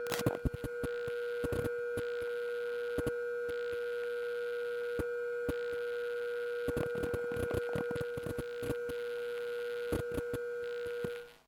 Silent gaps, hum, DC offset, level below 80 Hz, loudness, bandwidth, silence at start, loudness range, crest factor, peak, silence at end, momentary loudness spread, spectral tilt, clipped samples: none; none; under 0.1%; -54 dBFS; -37 LUFS; 18 kHz; 0 s; 1 LU; 26 dB; -10 dBFS; 0.1 s; 3 LU; -5.5 dB/octave; under 0.1%